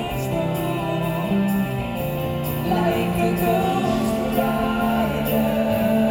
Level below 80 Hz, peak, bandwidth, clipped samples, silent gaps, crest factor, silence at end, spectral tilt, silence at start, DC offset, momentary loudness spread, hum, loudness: -40 dBFS; -6 dBFS; 19 kHz; under 0.1%; none; 16 dB; 0 s; -6.5 dB/octave; 0 s; under 0.1%; 5 LU; none; -22 LUFS